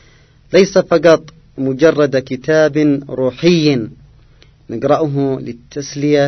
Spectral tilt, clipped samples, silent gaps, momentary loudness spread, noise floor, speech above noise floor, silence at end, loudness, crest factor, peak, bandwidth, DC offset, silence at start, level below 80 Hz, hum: -6 dB/octave; under 0.1%; none; 14 LU; -47 dBFS; 33 dB; 0 s; -14 LUFS; 14 dB; 0 dBFS; 6.4 kHz; under 0.1%; 0.5 s; -48 dBFS; none